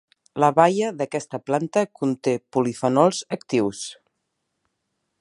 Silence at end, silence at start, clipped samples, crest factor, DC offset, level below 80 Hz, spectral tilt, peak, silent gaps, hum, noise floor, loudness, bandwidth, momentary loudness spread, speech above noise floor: 1.25 s; 0.35 s; under 0.1%; 22 dB; under 0.1%; -68 dBFS; -5.5 dB/octave; -2 dBFS; none; none; -77 dBFS; -22 LUFS; 11.5 kHz; 11 LU; 55 dB